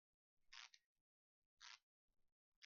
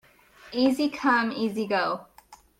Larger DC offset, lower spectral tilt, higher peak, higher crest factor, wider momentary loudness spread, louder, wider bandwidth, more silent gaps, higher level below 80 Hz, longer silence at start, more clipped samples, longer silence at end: neither; second, 5.5 dB/octave vs -5 dB/octave; second, -42 dBFS vs -10 dBFS; first, 28 dB vs 16 dB; second, 4 LU vs 8 LU; second, -63 LUFS vs -26 LUFS; second, 7 kHz vs 15.5 kHz; first, 0.86-1.57 s, 1.83-2.08 s, 2.32-2.62 s vs none; second, under -90 dBFS vs -66 dBFS; about the same, 0.4 s vs 0.45 s; neither; second, 0 s vs 0.25 s